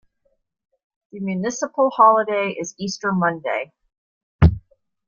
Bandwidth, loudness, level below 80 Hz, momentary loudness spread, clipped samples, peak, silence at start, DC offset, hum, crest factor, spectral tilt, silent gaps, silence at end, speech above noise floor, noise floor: 7.4 kHz; -20 LUFS; -36 dBFS; 13 LU; under 0.1%; -2 dBFS; 1.15 s; under 0.1%; none; 20 dB; -6 dB/octave; 3.98-4.39 s; 0.5 s; 49 dB; -69 dBFS